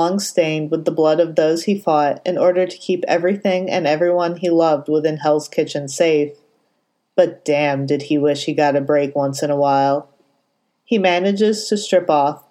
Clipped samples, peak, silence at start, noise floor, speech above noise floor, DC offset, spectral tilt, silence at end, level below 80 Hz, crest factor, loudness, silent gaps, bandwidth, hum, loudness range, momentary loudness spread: under 0.1%; 0 dBFS; 0 s; -68 dBFS; 51 dB; under 0.1%; -5 dB/octave; 0.1 s; -76 dBFS; 16 dB; -18 LUFS; none; 16 kHz; none; 2 LU; 5 LU